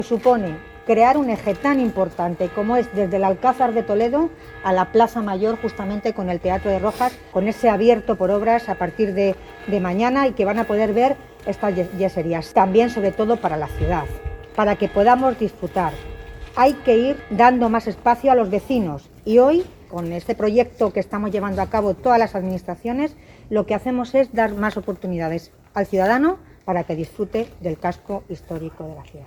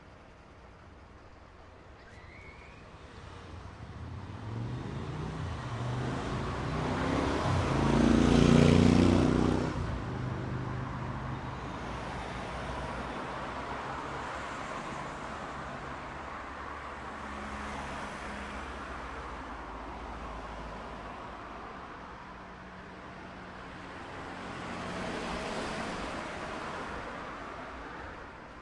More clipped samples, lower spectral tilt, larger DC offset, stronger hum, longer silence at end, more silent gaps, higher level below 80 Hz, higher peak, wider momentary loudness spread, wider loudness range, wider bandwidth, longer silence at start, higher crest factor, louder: neither; about the same, -7 dB/octave vs -6.5 dB/octave; neither; neither; about the same, 0 s vs 0 s; neither; about the same, -42 dBFS vs -46 dBFS; first, 0 dBFS vs -10 dBFS; second, 12 LU vs 22 LU; second, 4 LU vs 18 LU; first, 19 kHz vs 11.5 kHz; about the same, 0 s vs 0 s; about the same, 20 dB vs 24 dB; first, -20 LUFS vs -33 LUFS